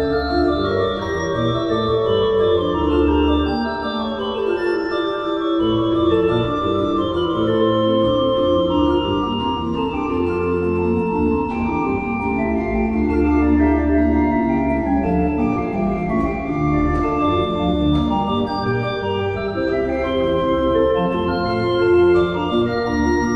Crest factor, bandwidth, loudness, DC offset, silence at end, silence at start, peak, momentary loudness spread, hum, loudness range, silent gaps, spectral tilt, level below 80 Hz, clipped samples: 14 dB; 7 kHz; -19 LUFS; under 0.1%; 0 s; 0 s; -4 dBFS; 5 LU; none; 2 LU; none; -8 dB/octave; -32 dBFS; under 0.1%